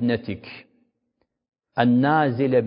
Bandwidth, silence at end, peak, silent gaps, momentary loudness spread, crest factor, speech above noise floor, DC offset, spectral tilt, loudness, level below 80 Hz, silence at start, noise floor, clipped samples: 5.4 kHz; 0 s; -4 dBFS; none; 17 LU; 20 dB; 54 dB; under 0.1%; -11.5 dB/octave; -21 LUFS; -58 dBFS; 0 s; -74 dBFS; under 0.1%